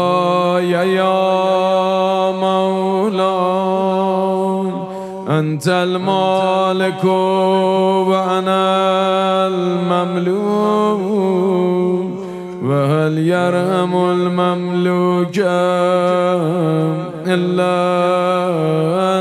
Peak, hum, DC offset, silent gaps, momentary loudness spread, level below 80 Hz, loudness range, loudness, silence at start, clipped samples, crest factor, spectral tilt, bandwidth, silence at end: -2 dBFS; none; under 0.1%; none; 3 LU; -62 dBFS; 2 LU; -16 LUFS; 0 s; under 0.1%; 14 dB; -7 dB/octave; 13.5 kHz; 0 s